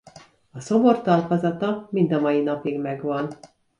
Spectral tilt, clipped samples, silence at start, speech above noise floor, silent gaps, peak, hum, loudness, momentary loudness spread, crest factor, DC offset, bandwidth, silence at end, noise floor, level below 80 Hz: -7.5 dB/octave; under 0.1%; 0.15 s; 28 dB; none; -6 dBFS; none; -22 LUFS; 10 LU; 18 dB; under 0.1%; 10.5 kHz; 0.35 s; -49 dBFS; -66 dBFS